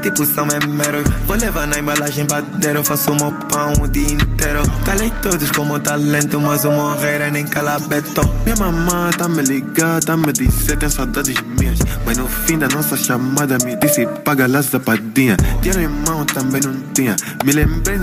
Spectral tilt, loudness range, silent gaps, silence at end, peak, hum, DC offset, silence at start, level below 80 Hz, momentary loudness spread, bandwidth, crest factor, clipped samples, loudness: -4.5 dB/octave; 1 LU; none; 0 s; -2 dBFS; none; under 0.1%; 0 s; -24 dBFS; 3 LU; 16 kHz; 14 dB; under 0.1%; -16 LUFS